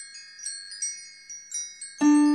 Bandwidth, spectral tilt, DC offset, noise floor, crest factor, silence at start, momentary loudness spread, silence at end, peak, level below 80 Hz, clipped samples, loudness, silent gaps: 11.5 kHz; -1.5 dB/octave; under 0.1%; -44 dBFS; 14 dB; 0 s; 19 LU; 0 s; -12 dBFS; -76 dBFS; under 0.1%; -28 LUFS; none